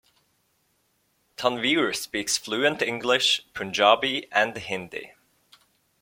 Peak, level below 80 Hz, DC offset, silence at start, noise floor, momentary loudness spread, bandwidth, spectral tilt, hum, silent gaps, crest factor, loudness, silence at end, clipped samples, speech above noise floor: -4 dBFS; -66 dBFS; under 0.1%; 1.4 s; -70 dBFS; 12 LU; 16.5 kHz; -2 dB/octave; none; none; 22 dB; -24 LUFS; 0.95 s; under 0.1%; 45 dB